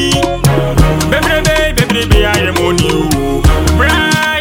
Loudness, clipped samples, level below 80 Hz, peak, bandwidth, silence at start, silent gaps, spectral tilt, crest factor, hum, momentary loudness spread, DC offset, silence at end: -11 LUFS; under 0.1%; -16 dBFS; 0 dBFS; 18 kHz; 0 s; none; -4.5 dB/octave; 10 dB; none; 2 LU; under 0.1%; 0 s